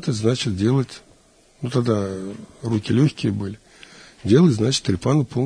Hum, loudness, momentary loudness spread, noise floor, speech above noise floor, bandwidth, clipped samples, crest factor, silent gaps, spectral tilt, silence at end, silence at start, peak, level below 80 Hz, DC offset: none; -21 LUFS; 16 LU; -54 dBFS; 34 dB; 10.5 kHz; under 0.1%; 18 dB; none; -6.5 dB/octave; 0 s; 0 s; -4 dBFS; -52 dBFS; under 0.1%